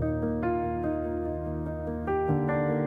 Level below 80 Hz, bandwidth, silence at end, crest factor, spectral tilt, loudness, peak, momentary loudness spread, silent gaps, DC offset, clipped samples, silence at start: -44 dBFS; 3.8 kHz; 0 s; 14 dB; -11 dB/octave; -30 LUFS; -14 dBFS; 6 LU; none; under 0.1%; under 0.1%; 0 s